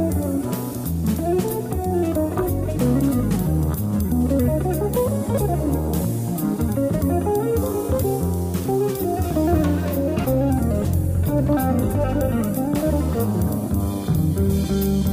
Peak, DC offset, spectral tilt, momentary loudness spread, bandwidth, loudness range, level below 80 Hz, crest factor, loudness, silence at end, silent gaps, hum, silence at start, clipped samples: -8 dBFS; under 0.1%; -7.5 dB/octave; 4 LU; 16 kHz; 1 LU; -30 dBFS; 12 dB; -21 LUFS; 0 s; none; none; 0 s; under 0.1%